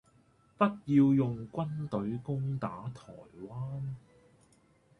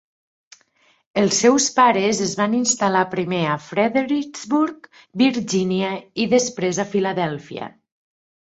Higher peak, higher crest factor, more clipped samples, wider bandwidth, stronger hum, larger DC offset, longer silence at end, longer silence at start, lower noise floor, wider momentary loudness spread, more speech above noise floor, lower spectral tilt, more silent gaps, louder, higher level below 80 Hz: second, -12 dBFS vs -2 dBFS; about the same, 20 dB vs 18 dB; neither; second, 6.4 kHz vs 8.2 kHz; neither; neither; first, 1 s vs 0.8 s; second, 0.6 s vs 1.15 s; first, -66 dBFS vs -60 dBFS; first, 20 LU vs 10 LU; second, 34 dB vs 40 dB; first, -9.5 dB/octave vs -4 dB/octave; neither; second, -32 LUFS vs -19 LUFS; about the same, -64 dBFS vs -62 dBFS